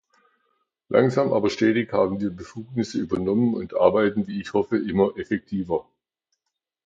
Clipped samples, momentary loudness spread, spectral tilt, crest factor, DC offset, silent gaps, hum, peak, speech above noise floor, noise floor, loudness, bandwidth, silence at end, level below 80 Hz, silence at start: under 0.1%; 9 LU; -7 dB/octave; 20 dB; under 0.1%; none; none; -4 dBFS; 60 dB; -83 dBFS; -23 LUFS; 7.8 kHz; 1.05 s; -54 dBFS; 0.9 s